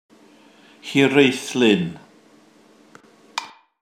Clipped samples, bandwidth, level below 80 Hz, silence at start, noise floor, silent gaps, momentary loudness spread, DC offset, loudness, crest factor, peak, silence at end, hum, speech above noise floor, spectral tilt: under 0.1%; 15.5 kHz; -68 dBFS; 0.85 s; -52 dBFS; none; 18 LU; under 0.1%; -19 LUFS; 22 dB; 0 dBFS; 0.35 s; none; 35 dB; -5 dB/octave